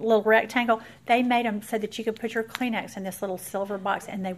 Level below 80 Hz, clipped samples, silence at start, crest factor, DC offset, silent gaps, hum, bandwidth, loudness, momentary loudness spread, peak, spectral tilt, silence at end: -66 dBFS; under 0.1%; 0 s; 18 dB; under 0.1%; none; none; 15.5 kHz; -26 LUFS; 10 LU; -8 dBFS; -4.5 dB/octave; 0 s